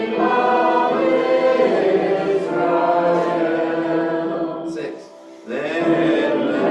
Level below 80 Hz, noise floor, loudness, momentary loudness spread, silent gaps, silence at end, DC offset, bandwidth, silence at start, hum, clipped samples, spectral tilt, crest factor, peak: -66 dBFS; -39 dBFS; -18 LUFS; 10 LU; none; 0 s; under 0.1%; 9 kHz; 0 s; none; under 0.1%; -6.5 dB/octave; 14 dB; -6 dBFS